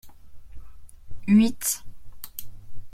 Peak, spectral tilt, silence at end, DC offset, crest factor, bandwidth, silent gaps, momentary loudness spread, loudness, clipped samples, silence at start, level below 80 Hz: -10 dBFS; -4.5 dB/octave; 0 s; under 0.1%; 16 dB; 16 kHz; none; 21 LU; -23 LUFS; under 0.1%; 0.05 s; -46 dBFS